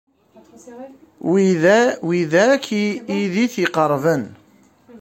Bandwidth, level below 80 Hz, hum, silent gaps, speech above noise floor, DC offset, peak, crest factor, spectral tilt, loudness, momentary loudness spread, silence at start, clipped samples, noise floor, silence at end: 16.5 kHz; -64 dBFS; none; none; 35 dB; under 0.1%; -2 dBFS; 16 dB; -5.5 dB/octave; -18 LUFS; 17 LU; 0.65 s; under 0.1%; -53 dBFS; 0.05 s